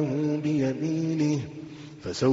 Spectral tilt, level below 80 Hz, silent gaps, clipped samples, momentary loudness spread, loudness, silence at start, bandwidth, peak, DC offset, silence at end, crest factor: -7.5 dB/octave; -60 dBFS; none; under 0.1%; 13 LU; -27 LUFS; 0 s; 7.8 kHz; -10 dBFS; under 0.1%; 0 s; 16 dB